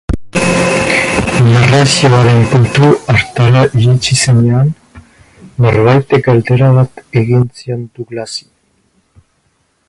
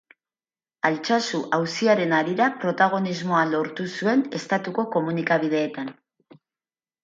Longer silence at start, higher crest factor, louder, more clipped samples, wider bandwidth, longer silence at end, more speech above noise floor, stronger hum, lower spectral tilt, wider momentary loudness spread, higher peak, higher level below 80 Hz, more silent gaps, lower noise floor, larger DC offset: second, 0.1 s vs 0.85 s; second, 10 dB vs 18 dB; first, -10 LUFS vs -23 LUFS; neither; first, 11.5 kHz vs 9 kHz; first, 1.5 s vs 1.1 s; second, 49 dB vs over 67 dB; neither; about the same, -5.5 dB/octave vs -5.5 dB/octave; first, 14 LU vs 6 LU; first, 0 dBFS vs -6 dBFS; first, -34 dBFS vs -74 dBFS; neither; second, -58 dBFS vs under -90 dBFS; neither